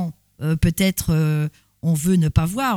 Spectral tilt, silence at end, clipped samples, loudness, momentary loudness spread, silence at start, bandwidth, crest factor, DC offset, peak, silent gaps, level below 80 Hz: -6 dB/octave; 0 s; under 0.1%; -21 LUFS; 10 LU; 0 s; 17 kHz; 16 dB; under 0.1%; -4 dBFS; none; -34 dBFS